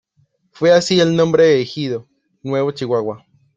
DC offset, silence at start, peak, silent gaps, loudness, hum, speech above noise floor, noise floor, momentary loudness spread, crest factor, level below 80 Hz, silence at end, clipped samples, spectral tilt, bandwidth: under 0.1%; 0.6 s; -2 dBFS; none; -16 LUFS; none; 46 dB; -61 dBFS; 15 LU; 16 dB; -58 dBFS; 0.4 s; under 0.1%; -5.5 dB/octave; 8 kHz